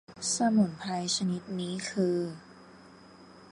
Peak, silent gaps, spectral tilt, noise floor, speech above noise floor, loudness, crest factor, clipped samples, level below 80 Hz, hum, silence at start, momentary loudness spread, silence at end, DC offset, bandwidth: -14 dBFS; none; -4.5 dB/octave; -53 dBFS; 23 dB; -30 LUFS; 18 dB; under 0.1%; -68 dBFS; none; 0.1 s; 9 LU; 0 s; under 0.1%; 11.5 kHz